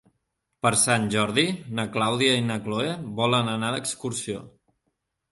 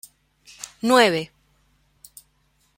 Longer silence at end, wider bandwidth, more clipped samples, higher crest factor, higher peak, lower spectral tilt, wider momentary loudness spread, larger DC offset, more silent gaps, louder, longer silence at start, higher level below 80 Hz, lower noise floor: second, 0.85 s vs 1.5 s; second, 12 kHz vs 16.5 kHz; neither; about the same, 20 dB vs 22 dB; second, -6 dBFS vs -2 dBFS; about the same, -3.5 dB/octave vs -3.5 dB/octave; second, 9 LU vs 22 LU; neither; neither; second, -24 LUFS vs -19 LUFS; second, 0.65 s vs 0.85 s; about the same, -62 dBFS vs -66 dBFS; first, -78 dBFS vs -65 dBFS